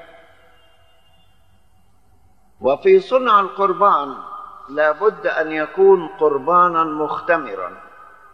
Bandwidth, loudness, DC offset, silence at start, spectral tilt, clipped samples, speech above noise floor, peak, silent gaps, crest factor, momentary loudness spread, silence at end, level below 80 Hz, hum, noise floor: 6 kHz; -17 LUFS; 0.3%; 2.6 s; -7 dB/octave; under 0.1%; 41 dB; -2 dBFS; none; 16 dB; 15 LU; 0.55 s; -62 dBFS; none; -58 dBFS